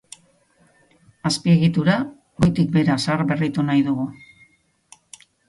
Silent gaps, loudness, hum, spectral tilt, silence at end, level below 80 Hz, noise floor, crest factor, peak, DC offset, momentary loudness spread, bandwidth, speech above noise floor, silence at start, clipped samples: none; -20 LUFS; none; -6.5 dB/octave; 1.35 s; -52 dBFS; -59 dBFS; 18 dB; -4 dBFS; under 0.1%; 9 LU; 11.5 kHz; 40 dB; 1.25 s; under 0.1%